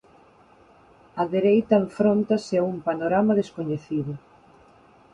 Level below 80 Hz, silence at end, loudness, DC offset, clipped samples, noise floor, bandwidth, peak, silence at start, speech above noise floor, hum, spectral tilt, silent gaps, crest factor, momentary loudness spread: -62 dBFS; 0.95 s; -23 LUFS; under 0.1%; under 0.1%; -54 dBFS; 9 kHz; -6 dBFS; 1.15 s; 32 dB; none; -8 dB/octave; none; 20 dB; 10 LU